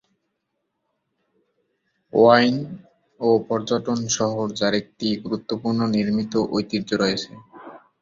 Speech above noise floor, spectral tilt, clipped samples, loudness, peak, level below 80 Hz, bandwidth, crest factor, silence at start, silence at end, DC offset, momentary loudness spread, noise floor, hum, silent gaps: 56 dB; -4.5 dB/octave; under 0.1%; -21 LUFS; -2 dBFS; -60 dBFS; 7.6 kHz; 22 dB; 2.15 s; 0.25 s; under 0.1%; 12 LU; -77 dBFS; none; none